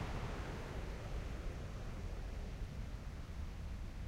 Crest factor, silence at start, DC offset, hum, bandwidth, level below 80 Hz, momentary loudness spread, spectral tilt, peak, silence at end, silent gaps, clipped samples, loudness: 14 dB; 0 s; under 0.1%; none; 15.5 kHz; -46 dBFS; 4 LU; -6 dB/octave; -30 dBFS; 0 s; none; under 0.1%; -47 LUFS